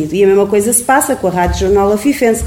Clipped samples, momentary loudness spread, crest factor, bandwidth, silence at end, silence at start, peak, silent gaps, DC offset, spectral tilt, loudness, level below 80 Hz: under 0.1%; 4 LU; 10 dB; 17 kHz; 0 s; 0 s; 0 dBFS; none; 0.1%; -4.5 dB/octave; -11 LUFS; -28 dBFS